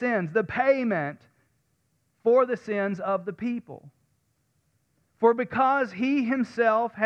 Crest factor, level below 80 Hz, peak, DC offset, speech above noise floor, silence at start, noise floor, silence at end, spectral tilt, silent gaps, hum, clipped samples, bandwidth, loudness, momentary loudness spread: 18 dB; -68 dBFS; -8 dBFS; under 0.1%; 47 dB; 0 s; -72 dBFS; 0 s; -7.5 dB/octave; none; none; under 0.1%; 8 kHz; -25 LUFS; 8 LU